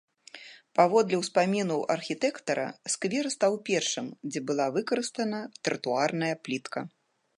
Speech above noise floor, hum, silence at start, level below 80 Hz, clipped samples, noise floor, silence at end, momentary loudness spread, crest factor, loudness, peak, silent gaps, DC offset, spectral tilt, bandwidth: 21 dB; none; 0.35 s; -80 dBFS; under 0.1%; -50 dBFS; 0.5 s; 11 LU; 22 dB; -29 LUFS; -8 dBFS; none; under 0.1%; -4 dB/octave; 11.5 kHz